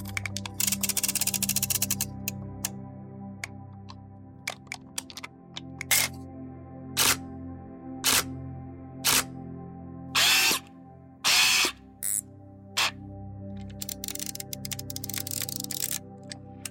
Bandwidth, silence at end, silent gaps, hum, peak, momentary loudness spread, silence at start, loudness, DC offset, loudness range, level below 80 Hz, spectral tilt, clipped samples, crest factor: 17 kHz; 0 s; none; none; -8 dBFS; 20 LU; 0 s; -26 LUFS; under 0.1%; 9 LU; -56 dBFS; -1 dB/octave; under 0.1%; 22 dB